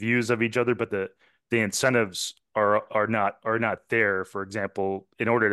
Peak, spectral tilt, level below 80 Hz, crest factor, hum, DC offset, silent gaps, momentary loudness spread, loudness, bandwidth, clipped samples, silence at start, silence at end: -8 dBFS; -4.5 dB/octave; -70 dBFS; 18 dB; none; under 0.1%; none; 8 LU; -26 LUFS; 12.5 kHz; under 0.1%; 0 s; 0 s